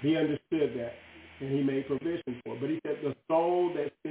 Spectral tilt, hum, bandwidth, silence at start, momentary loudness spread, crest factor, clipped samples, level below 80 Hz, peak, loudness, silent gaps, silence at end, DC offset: -6 dB/octave; none; 4 kHz; 0 s; 12 LU; 16 dB; under 0.1%; -66 dBFS; -16 dBFS; -31 LUFS; none; 0 s; under 0.1%